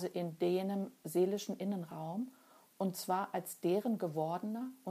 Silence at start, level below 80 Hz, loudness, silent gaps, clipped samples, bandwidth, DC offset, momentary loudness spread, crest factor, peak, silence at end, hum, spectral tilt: 0 s; -90 dBFS; -38 LUFS; none; under 0.1%; 15.5 kHz; under 0.1%; 8 LU; 16 dB; -22 dBFS; 0 s; none; -6 dB/octave